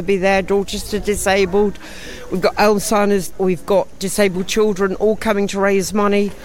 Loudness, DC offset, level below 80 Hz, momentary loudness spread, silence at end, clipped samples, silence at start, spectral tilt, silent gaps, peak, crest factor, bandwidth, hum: -17 LUFS; under 0.1%; -38 dBFS; 7 LU; 0 s; under 0.1%; 0 s; -4.5 dB/octave; none; -2 dBFS; 14 dB; 16.5 kHz; none